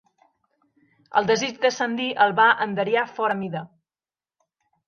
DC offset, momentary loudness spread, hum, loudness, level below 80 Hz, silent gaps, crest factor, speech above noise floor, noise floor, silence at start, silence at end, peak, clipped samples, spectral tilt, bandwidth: under 0.1%; 9 LU; none; -22 LUFS; -72 dBFS; none; 20 dB; over 68 dB; under -90 dBFS; 1.15 s; 1.2 s; -4 dBFS; under 0.1%; -4 dB/octave; 7.2 kHz